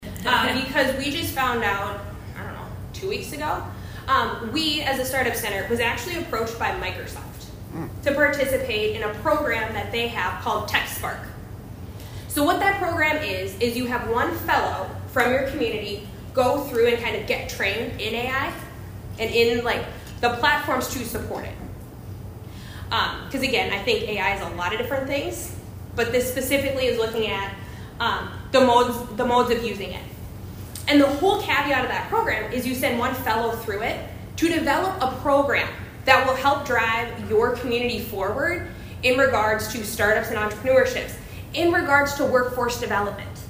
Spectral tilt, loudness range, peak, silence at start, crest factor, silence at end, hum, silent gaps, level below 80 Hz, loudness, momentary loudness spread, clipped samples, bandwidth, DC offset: -4 dB/octave; 4 LU; 0 dBFS; 0 s; 24 dB; 0 s; none; none; -44 dBFS; -23 LUFS; 16 LU; under 0.1%; 16 kHz; under 0.1%